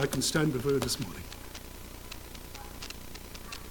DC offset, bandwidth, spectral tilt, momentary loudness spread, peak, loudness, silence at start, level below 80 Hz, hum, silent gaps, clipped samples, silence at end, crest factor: under 0.1%; 19 kHz; -4 dB/octave; 16 LU; -14 dBFS; -33 LUFS; 0 s; -48 dBFS; none; none; under 0.1%; 0 s; 20 dB